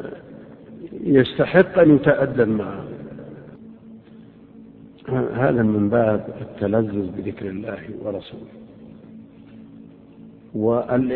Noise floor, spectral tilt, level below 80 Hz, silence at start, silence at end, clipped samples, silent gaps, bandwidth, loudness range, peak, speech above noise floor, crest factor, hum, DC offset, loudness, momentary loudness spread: -45 dBFS; -11.5 dB/octave; -52 dBFS; 0 s; 0 s; under 0.1%; none; 4.4 kHz; 12 LU; 0 dBFS; 26 dB; 22 dB; none; under 0.1%; -20 LUFS; 25 LU